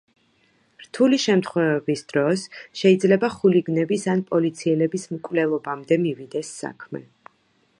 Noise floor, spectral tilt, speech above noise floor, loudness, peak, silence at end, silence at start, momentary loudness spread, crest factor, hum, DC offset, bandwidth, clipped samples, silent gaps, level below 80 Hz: -64 dBFS; -6 dB/octave; 43 dB; -22 LUFS; -4 dBFS; 0.8 s; 0.8 s; 15 LU; 18 dB; none; under 0.1%; 11 kHz; under 0.1%; none; -68 dBFS